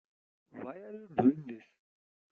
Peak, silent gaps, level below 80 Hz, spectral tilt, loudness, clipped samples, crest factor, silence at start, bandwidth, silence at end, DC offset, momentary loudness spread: -14 dBFS; none; -74 dBFS; -8.5 dB/octave; -31 LUFS; under 0.1%; 22 dB; 0.55 s; 3.7 kHz; 0.75 s; under 0.1%; 21 LU